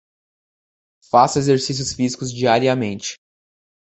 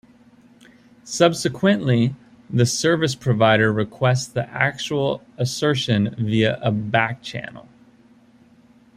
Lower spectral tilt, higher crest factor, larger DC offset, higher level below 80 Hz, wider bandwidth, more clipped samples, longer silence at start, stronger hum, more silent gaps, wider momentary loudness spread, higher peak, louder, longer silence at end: about the same, -4.5 dB/octave vs -5 dB/octave; about the same, 18 dB vs 20 dB; neither; about the same, -54 dBFS vs -56 dBFS; second, 8.4 kHz vs 14.5 kHz; neither; about the same, 1.15 s vs 1.05 s; neither; neither; about the same, 9 LU vs 9 LU; about the same, -2 dBFS vs -2 dBFS; about the same, -18 LUFS vs -20 LUFS; second, 0.75 s vs 1.35 s